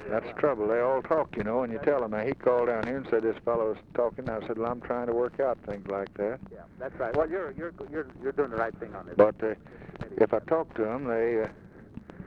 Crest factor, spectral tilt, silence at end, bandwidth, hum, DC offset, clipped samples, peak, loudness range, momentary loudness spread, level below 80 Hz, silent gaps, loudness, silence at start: 20 dB; -9 dB/octave; 0 s; 5.8 kHz; none; under 0.1%; under 0.1%; -8 dBFS; 5 LU; 13 LU; -56 dBFS; none; -29 LUFS; 0 s